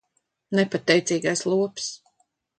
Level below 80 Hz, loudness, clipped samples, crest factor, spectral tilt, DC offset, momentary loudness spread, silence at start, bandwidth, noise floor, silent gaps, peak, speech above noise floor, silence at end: -70 dBFS; -23 LUFS; under 0.1%; 20 dB; -4 dB/octave; under 0.1%; 12 LU; 0.5 s; 9.4 kHz; -70 dBFS; none; -4 dBFS; 47 dB; 0.65 s